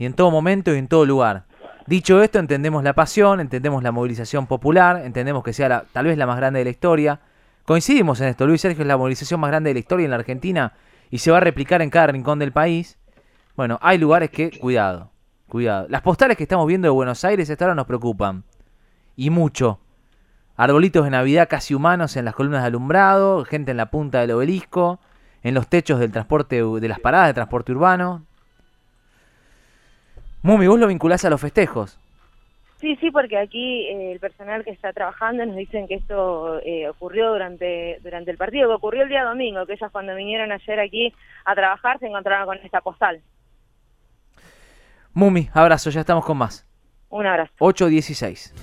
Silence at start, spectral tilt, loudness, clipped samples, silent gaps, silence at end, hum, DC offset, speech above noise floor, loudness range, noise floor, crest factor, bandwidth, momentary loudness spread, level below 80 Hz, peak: 0 s; -6.5 dB/octave; -19 LUFS; under 0.1%; none; 0 s; none; under 0.1%; 40 dB; 7 LU; -58 dBFS; 20 dB; 14 kHz; 13 LU; -46 dBFS; 0 dBFS